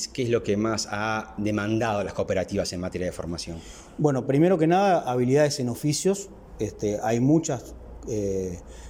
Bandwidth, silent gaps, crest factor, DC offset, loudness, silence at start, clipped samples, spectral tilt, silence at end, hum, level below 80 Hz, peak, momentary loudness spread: 17 kHz; none; 18 dB; under 0.1%; -25 LUFS; 0 s; under 0.1%; -5.5 dB/octave; 0 s; none; -48 dBFS; -8 dBFS; 12 LU